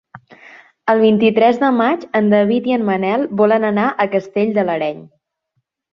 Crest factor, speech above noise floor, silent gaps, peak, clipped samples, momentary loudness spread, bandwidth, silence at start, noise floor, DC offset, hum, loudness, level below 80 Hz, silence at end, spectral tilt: 16 dB; 56 dB; none; -2 dBFS; under 0.1%; 6 LU; 6.2 kHz; 0.15 s; -71 dBFS; under 0.1%; none; -15 LUFS; -62 dBFS; 0.9 s; -8 dB/octave